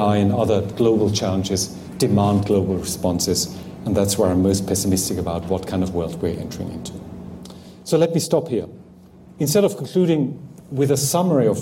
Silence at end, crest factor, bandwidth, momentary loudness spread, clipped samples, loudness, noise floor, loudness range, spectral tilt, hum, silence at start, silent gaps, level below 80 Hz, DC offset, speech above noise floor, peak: 0 s; 14 dB; 16.5 kHz; 13 LU; under 0.1%; -20 LUFS; -45 dBFS; 5 LU; -5.5 dB/octave; none; 0 s; none; -46 dBFS; under 0.1%; 25 dB; -6 dBFS